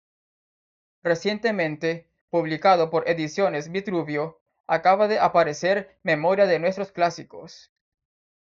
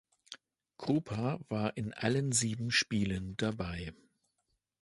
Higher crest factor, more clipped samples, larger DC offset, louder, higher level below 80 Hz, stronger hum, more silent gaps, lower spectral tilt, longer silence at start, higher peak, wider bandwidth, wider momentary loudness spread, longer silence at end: about the same, 18 dB vs 22 dB; neither; neither; first, -23 LUFS vs -34 LUFS; second, -68 dBFS vs -56 dBFS; neither; first, 2.21-2.28 s, 4.41-4.46 s, 4.60-4.64 s vs none; about the same, -3.5 dB/octave vs -4 dB/octave; first, 1.05 s vs 0.3 s; first, -6 dBFS vs -14 dBFS; second, 7.6 kHz vs 11.5 kHz; second, 10 LU vs 18 LU; about the same, 0.95 s vs 0.9 s